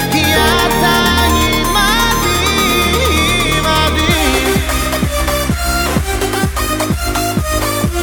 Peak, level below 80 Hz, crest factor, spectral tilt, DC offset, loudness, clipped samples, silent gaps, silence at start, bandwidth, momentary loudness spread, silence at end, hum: 0 dBFS; -22 dBFS; 12 dB; -3.5 dB/octave; under 0.1%; -13 LUFS; under 0.1%; none; 0 s; over 20 kHz; 5 LU; 0 s; none